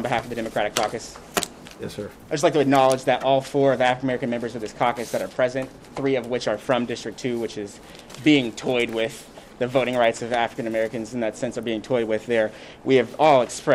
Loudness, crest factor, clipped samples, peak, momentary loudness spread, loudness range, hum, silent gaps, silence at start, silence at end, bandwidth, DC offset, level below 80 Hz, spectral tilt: -23 LUFS; 18 dB; under 0.1%; -4 dBFS; 14 LU; 4 LU; none; none; 0 s; 0 s; 16 kHz; under 0.1%; -56 dBFS; -4.5 dB/octave